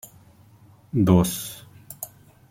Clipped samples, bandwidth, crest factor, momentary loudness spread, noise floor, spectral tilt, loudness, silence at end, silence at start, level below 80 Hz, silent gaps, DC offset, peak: under 0.1%; 16.5 kHz; 22 dB; 22 LU; -52 dBFS; -6.5 dB/octave; -21 LUFS; 0.45 s; 0.95 s; -52 dBFS; none; under 0.1%; -2 dBFS